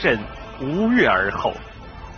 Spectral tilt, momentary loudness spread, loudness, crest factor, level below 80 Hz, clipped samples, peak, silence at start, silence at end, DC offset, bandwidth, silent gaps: -3.5 dB/octave; 20 LU; -20 LUFS; 20 dB; -40 dBFS; under 0.1%; -2 dBFS; 0 s; 0 s; under 0.1%; 6.6 kHz; none